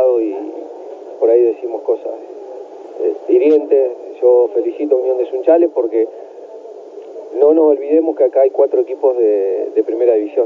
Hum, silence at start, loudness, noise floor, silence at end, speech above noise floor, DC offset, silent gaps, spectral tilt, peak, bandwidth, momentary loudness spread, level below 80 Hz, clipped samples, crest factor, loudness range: none; 0 s; -14 LUFS; -33 dBFS; 0 s; 20 dB; under 0.1%; none; -6.5 dB/octave; 0 dBFS; 4 kHz; 20 LU; under -90 dBFS; under 0.1%; 14 dB; 3 LU